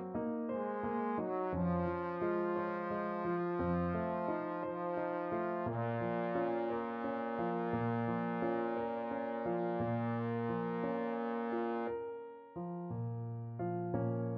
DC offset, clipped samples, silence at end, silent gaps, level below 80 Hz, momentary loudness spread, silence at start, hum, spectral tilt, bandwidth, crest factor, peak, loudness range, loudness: under 0.1%; under 0.1%; 0 s; none; -64 dBFS; 6 LU; 0 s; none; -7.5 dB/octave; 5.4 kHz; 14 dB; -22 dBFS; 3 LU; -38 LUFS